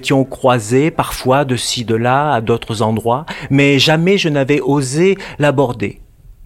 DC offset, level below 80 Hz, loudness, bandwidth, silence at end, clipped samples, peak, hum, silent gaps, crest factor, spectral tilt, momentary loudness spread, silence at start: under 0.1%; -42 dBFS; -14 LUFS; 16.5 kHz; 0 s; under 0.1%; 0 dBFS; none; none; 14 dB; -5 dB/octave; 7 LU; 0 s